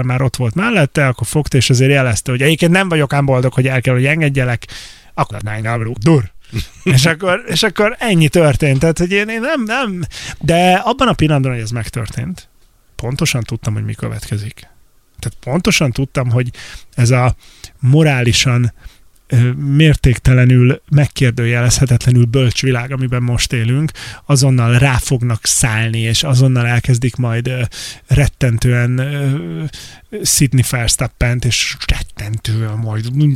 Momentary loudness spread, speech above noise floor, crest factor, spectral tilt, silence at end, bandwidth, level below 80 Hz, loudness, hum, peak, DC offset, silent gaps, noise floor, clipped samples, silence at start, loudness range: 12 LU; 29 dB; 14 dB; -5 dB/octave; 0 s; 15 kHz; -30 dBFS; -14 LUFS; none; 0 dBFS; under 0.1%; none; -43 dBFS; under 0.1%; 0 s; 5 LU